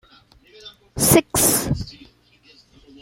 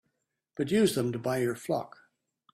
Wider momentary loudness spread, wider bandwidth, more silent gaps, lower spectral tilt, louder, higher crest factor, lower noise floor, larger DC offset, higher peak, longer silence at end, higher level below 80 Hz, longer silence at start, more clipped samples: first, 20 LU vs 15 LU; about the same, 16.5 kHz vs 16 kHz; neither; second, -3.5 dB/octave vs -5.5 dB/octave; first, -17 LUFS vs -29 LUFS; about the same, 22 dB vs 18 dB; second, -54 dBFS vs -81 dBFS; neither; first, 0 dBFS vs -12 dBFS; first, 1.1 s vs 0.65 s; first, -42 dBFS vs -68 dBFS; about the same, 0.65 s vs 0.55 s; neither